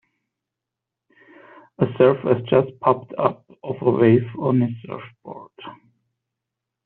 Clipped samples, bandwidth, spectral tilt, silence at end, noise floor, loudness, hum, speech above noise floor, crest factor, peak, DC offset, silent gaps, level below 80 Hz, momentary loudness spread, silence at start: under 0.1%; 4.2 kHz; -7.5 dB/octave; 1.1 s; -85 dBFS; -20 LUFS; none; 65 dB; 20 dB; -4 dBFS; under 0.1%; none; -62 dBFS; 23 LU; 1.8 s